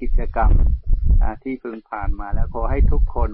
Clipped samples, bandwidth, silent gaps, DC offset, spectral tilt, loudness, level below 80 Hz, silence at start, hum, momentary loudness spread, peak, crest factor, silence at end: under 0.1%; 2.6 kHz; none; under 0.1%; -13.5 dB/octave; -23 LUFS; -18 dBFS; 0 s; none; 10 LU; -6 dBFS; 12 dB; 0 s